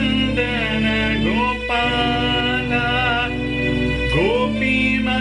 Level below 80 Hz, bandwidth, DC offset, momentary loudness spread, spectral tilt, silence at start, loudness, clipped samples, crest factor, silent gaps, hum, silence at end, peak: -32 dBFS; 10.5 kHz; under 0.1%; 3 LU; -6 dB/octave; 0 s; -18 LUFS; under 0.1%; 12 dB; none; none; 0 s; -8 dBFS